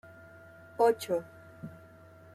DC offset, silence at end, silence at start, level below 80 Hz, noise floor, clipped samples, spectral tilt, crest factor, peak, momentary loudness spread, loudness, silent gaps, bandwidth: under 0.1%; 0.6 s; 0.8 s; -74 dBFS; -54 dBFS; under 0.1%; -5 dB/octave; 22 dB; -12 dBFS; 25 LU; -29 LUFS; none; 15.5 kHz